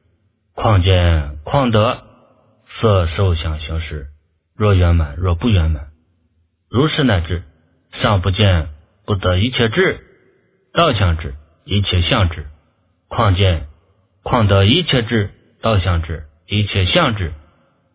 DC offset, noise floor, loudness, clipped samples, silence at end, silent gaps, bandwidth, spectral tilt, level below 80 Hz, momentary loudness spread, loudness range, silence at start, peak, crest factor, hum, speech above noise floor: under 0.1%; -62 dBFS; -16 LUFS; under 0.1%; 0.55 s; none; 4 kHz; -10.5 dB/octave; -26 dBFS; 14 LU; 3 LU; 0.55 s; 0 dBFS; 16 dB; none; 47 dB